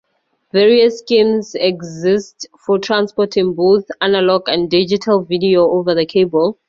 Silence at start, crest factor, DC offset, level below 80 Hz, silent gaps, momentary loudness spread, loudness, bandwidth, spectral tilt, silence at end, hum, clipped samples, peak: 0.55 s; 14 dB; under 0.1%; -56 dBFS; none; 6 LU; -14 LUFS; 7.4 kHz; -5.5 dB/octave; 0.15 s; none; under 0.1%; 0 dBFS